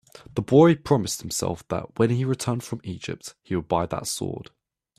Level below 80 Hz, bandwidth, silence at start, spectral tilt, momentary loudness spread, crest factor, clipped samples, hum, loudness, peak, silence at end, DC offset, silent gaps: -54 dBFS; 15.5 kHz; 0.35 s; -6 dB/octave; 16 LU; 20 dB; under 0.1%; none; -24 LUFS; -4 dBFS; 0.55 s; under 0.1%; none